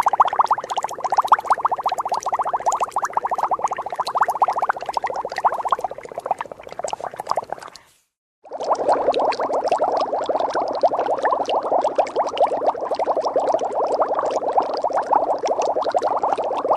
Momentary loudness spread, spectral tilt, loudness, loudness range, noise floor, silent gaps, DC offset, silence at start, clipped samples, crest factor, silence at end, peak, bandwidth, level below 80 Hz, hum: 8 LU; -3 dB/octave; -21 LUFS; 5 LU; -49 dBFS; 8.18-8.42 s; under 0.1%; 0 s; under 0.1%; 18 dB; 0 s; -2 dBFS; 14 kHz; -62 dBFS; none